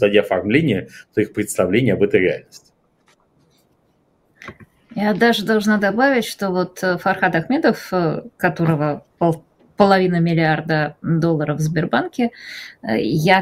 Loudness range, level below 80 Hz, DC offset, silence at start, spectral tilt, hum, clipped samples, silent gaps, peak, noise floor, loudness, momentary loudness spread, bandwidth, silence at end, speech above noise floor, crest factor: 5 LU; -54 dBFS; under 0.1%; 0 s; -6 dB/octave; none; under 0.1%; none; 0 dBFS; -61 dBFS; -18 LUFS; 9 LU; 16 kHz; 0 s; 43 dB; 18 dB